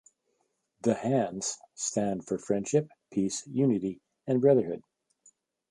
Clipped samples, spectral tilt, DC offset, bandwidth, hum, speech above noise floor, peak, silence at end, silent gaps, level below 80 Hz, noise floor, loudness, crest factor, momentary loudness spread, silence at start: under 0.1%; -5.5 dB/octave; under 0.1%; 11.5 kHz; none; 49 dB; -10 dBFS; 0.9 s; none; -68 dBFS; -77 dBFS; -29 LUFS; 20 dB; 11 LU; 0.85 s